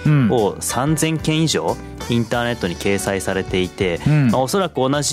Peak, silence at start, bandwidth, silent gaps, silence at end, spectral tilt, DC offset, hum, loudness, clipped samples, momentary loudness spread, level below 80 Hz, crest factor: -6 dBFS; 0 s; 15.5 kHz; none; 0 s; -5 dB/octave; under 0.1%; none; -19 LUFS; under 0.1%; 6 LU; -40 dBFS; 14 dB